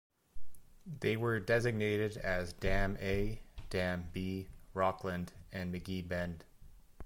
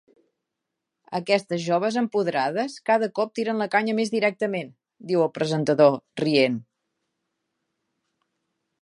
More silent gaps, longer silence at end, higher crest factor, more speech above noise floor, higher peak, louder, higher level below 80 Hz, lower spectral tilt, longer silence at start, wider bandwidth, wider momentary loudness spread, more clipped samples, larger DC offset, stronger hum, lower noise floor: neither; second, 0 s vs 2.2 s; about the same, 18 dB vs 22 dB; second, 21 dB vs 60 dB; second, -18 dBFS vs -4 dBFS; second, -37 LUFS vs -24 LUFS; first, -46 dBFS vs -76 dBFS; about the same, -6.5 dB/octave vs -5.5 dB/octave; second, 0.35 s vs 1.1 s; first, 16.5 kHz vs 11.5 kHz; first, 12 LU vs 9 LU; neither; neither; neither; second, -56 dBFS vs -83 dBFS